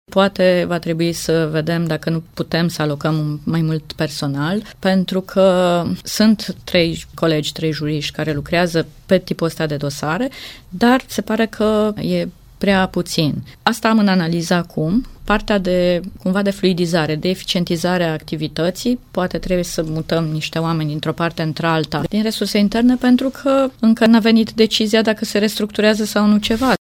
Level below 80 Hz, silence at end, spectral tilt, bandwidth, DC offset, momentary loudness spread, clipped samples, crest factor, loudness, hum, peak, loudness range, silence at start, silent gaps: -42 dBFS; 0.1 s; -5.5 dB/octave; 17 kHz; under 0.1%; 7 LU; under 0.1%; 16 dB; -18 LUFS; none; 0 dBFS; 5 LU; 0.1 s; none